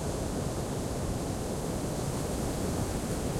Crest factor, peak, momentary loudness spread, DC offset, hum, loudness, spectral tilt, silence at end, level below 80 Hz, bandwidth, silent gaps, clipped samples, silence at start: 12 dB; -20 dBFS; 2 LU; under 0.1%; none; -33 LUFS; -5.5 dB/octave; 0 s; -42 dBFS; 16.5 kHz; none; under 0.1%; 0 s